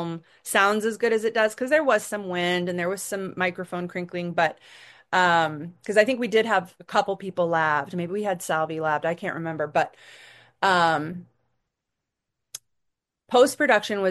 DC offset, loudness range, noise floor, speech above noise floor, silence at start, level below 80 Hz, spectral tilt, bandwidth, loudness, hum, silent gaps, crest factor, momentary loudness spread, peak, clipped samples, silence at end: under 0.1%; 4 LU; -83 dBFS; 59 dB; 0 s; -72 dBFS; -4 dB/octave; 12.5 kHz; -24 LUFS; none; none; 20 dB; 11 LU; -4 dBFS; under 0.1%; 0 s